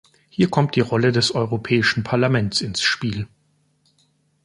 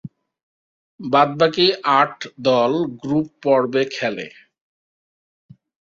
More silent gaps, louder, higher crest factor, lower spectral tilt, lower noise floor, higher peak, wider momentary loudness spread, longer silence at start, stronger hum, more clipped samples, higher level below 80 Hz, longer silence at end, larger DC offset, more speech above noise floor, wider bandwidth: second, none vs 0.43-0.98 s; about the same, -20 LUFS vs -18 LUFS; about the same, 20 dB vs 20 dB; about the same, -5 dB/octave vs -5.5 dB/octave; second, -64 dBFS vs under -90 dBFS; about the same, -2 dBFS vs -2 dBFS; about the same, 8 LU vs 9 LU; first, 0.4 s vs 0.05 s; neither; neither; first, -52 dBFS vs -64 dBFS; second, 1.2 s vs 1.65 s; neither; second, 44 dB vs over 71 dB; first, 11.5 kHz vs 7.6 kHz